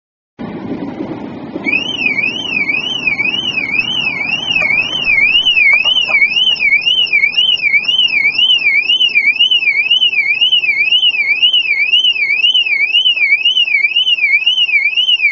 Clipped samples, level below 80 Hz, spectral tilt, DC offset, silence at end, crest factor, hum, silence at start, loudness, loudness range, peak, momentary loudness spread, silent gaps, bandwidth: under 0.1%; -50 dBFS; 2.5 dB/octave; under 0.1%; 0 s; 12 dB; none; 0.4 s; -9 LUFS; 5 LU; 0 dBFS; 7 LU; none; 7.2 kHz